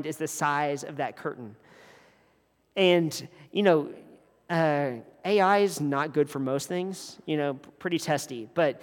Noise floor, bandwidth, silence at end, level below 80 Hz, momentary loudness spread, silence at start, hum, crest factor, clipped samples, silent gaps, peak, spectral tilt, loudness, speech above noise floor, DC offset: -67 dBFS; 19 kHz; 0 s; -78 dBFS; 13 LU; 0 s; none; 20 dB; under 0.1%; none; -8 dBFS; -5 dB/octave; -27 LUFS; 40 dB; under 0.1%